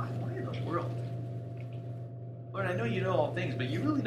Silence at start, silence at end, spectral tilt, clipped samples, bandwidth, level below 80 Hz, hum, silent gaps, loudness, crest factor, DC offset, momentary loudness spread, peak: 0 s; 0 s; -8 dB/octave; under 0.1%; 9.2 kHz; -68 dBFS; none; none; -35 LUFS; 18 dB; under 0.1%; 11 LU; -16 dBFS